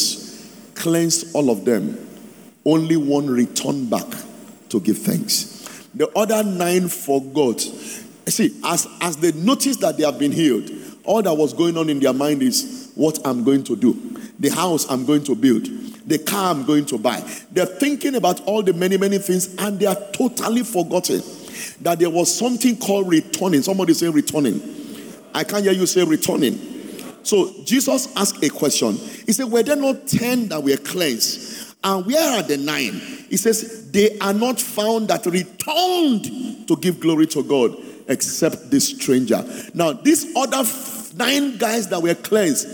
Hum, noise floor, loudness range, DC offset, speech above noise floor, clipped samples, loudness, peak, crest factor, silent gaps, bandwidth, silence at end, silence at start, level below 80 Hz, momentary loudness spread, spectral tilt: none; -42 dBFS; 2 LU; under 0.1%; 23 dB; under 0.1%; -19 LUFS; -4 dBFS; 16 dB; none; over 20 kHz; 0 s; 0 s; -66 dBFS; 10 LU; -4 dB/octave